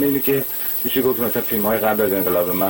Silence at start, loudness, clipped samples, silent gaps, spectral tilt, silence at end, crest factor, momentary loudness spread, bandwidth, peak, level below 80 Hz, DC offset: 0 s; -18 LUFS; under 0.1%; none; -5 dB/octave; 0 s; 14 dB; 2 LU; 17 kHz; -6 dBFS; -52 dBFS; 0.1%